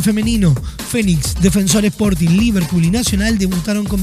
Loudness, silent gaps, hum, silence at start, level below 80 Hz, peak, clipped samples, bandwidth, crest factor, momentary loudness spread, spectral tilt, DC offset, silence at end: -15 LUFS; none; none; 0 s; -26 dBFS; 0 dBFS; under 0.1%; 15.5 kHz; 14 dB; 5 LU; -5 dB/octave; under 0.1%; 0 s